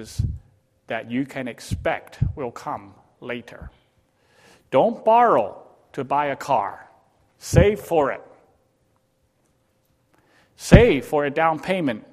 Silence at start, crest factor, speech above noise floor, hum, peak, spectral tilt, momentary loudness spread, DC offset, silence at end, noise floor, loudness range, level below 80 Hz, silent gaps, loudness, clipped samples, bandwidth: 0 s; 22 dB; 46 dB; none; 0 dBFS; -6.5 dB/octave; 19 LU; under 0.1%; 0.1 s; -66 dBFS; 8 LU; -36 dBFS; none; -21 LUFS; under 0.1%; 15.5 kHz